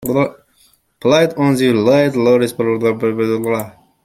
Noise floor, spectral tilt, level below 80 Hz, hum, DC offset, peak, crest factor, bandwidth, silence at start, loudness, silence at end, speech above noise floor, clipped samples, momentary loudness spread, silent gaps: -55 dBFS; -6 dB/octave; -54 dBFS; none; under 0.1%; -2 dBFS; 14 dB; 16 kHz; 0 s; -15 LUFS; 0.35 s; 41 dB; under 0.1%; 8 LU; none